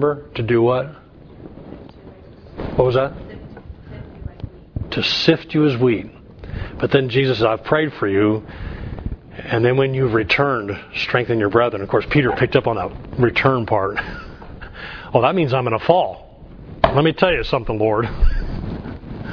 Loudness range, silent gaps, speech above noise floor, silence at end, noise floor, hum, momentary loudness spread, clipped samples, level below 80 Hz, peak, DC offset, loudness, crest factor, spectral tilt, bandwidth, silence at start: 5 LU; none; 23 dB; 0 s; -41 dBFS; none; 20 LU; under 0.1%; -32 dBFS; 0 dBFS; under 0.1%; -18 LUFS; 20 dB; -7.5 dB/octave; 5.4 kHz; 0 s